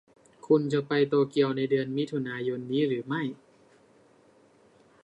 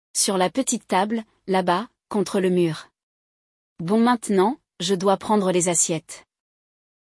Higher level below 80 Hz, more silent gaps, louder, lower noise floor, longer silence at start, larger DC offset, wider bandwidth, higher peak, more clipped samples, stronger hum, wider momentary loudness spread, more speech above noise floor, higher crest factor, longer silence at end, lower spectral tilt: second, -76 dBFS vs -66 dBFS; second, none vs 3.03-3.76 s; second, -28 LUFS vs -22 LUFS; second, -60 dBFS vs under -90 dBFS; first, 0.45 s vs 0.15 s; neither; second, 8.8 kHz vs 12 kHz; second, -10 dBFS vs -6 dBFS; neither; neither; about the same, 8 LU vs 10 LU; second, 33 dB vs over 69 dB; about the same, 18 dB vs 16 dB; first, 1.7 s vs 0.9 s; first, -7.5 dB/octave vs -4 dB/octave